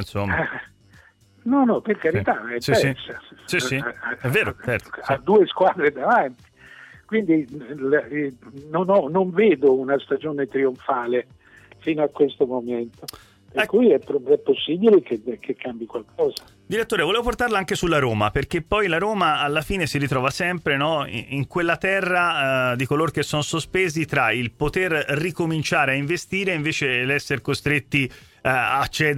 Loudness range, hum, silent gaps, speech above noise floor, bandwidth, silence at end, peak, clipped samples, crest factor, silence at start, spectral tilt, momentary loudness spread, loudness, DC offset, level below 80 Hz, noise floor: 2 LU; none; none; 31 dB; 16 kHz; 0 s; -6 dBFS; under 0.1%; 16 dB; 0 s; -5.5 dB/octave; 10 LU; -21 LUFS; under 0.1%; -48 dBFS; -53 dBFS